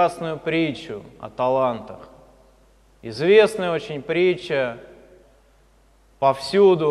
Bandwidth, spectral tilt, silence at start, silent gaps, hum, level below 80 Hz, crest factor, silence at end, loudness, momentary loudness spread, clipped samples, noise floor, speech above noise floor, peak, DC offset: 12 kHz; -6 dB/octave; 0 s; none; none; -56 dBFS; 20 dB; 0 s; -20 LUFS; 20 LU; under 0.1%; -56 dBFS; 36 dB; -2 dBFS; under 0.1%